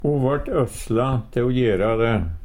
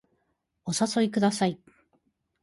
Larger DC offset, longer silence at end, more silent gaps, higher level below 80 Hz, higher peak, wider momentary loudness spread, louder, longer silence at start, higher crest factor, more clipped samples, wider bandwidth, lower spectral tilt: neither; second, 0 s vs 0.85 s; neither; first, -34 dBFS vs -68 dBFS; first, -8 dBFS vs -12 dBFS; second, 3 LU vs 14 LU; first, -21 LUFS vs -26 LUFS; second, 0 s vs 0.65 s; about the same, 12 dB vs 16 dB; neither; first, 16.5 kHz vs 11.5 kHz; first, -7.5 dB/octave vs -4.5 dB/octave